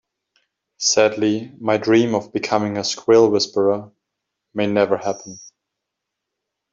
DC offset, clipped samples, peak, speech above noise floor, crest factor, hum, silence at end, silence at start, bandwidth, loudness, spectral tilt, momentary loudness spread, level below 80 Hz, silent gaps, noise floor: under 0.1%; under 0.1%; -2 dBFS; 63 dB; 18 dB; none; 1.25 s; 0.8 s; 7.8 kHz; -18 LUFS; -4 dB/octave; 11 LU; -64 dBFS; none; -81 dBFS